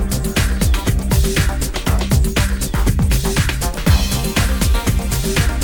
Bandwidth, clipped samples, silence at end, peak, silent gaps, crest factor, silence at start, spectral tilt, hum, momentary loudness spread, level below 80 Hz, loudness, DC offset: over 20 kHz; under 0.1%; 0 s; -2 dBFS; none; 14 dB; 0 s; -4.5 dB/octave; none; 3 LU; -18 dBFS; -17 LUFS; under 0.1%